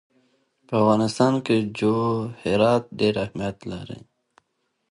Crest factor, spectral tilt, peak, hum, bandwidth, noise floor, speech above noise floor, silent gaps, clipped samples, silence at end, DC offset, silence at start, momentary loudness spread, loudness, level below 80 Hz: 18 dB; -6.5 dB/octave; -6 dBFS; none; 11.5 kHz; -74 dBFS; 52 dB; none; under 0.1%; 0.95 s; under 0.1%; 0.7 s; 15 LU; -22 LUFS; -54 dBFS